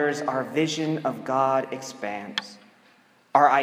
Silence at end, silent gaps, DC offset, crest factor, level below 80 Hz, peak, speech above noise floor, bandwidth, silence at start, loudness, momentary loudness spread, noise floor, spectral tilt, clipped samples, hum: 0 s; none; under 0.1%; 22 dB; -82 dBFS; -4 dBFS; 34 dB; 15.5 kHz; 0 s; -25 LUFS; 12 LU; -58 dBFS; -4.5 dB/octave; under 0.1%; none